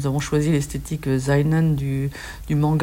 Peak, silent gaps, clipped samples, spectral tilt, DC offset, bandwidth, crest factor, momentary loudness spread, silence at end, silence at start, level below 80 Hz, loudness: -8 dBFS; none; under 0.1%; -7 dB/octave; under 0.1%; 16 kHz; 12 dB; 8 LU; 0 s; 0 s; -38 dBFS; -22 LUFS